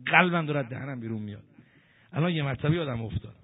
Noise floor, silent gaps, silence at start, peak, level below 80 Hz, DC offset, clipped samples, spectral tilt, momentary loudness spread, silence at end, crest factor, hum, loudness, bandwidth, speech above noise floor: -60 dBFS; none; 0 s; -2 dBFS; -54 dBFS; under 0.1%; under 0.1%; -4.5 dB/octave; 14 LU; 0.1 s; 26 dB; none; -28 LUFS; 4 kHz; 32 dB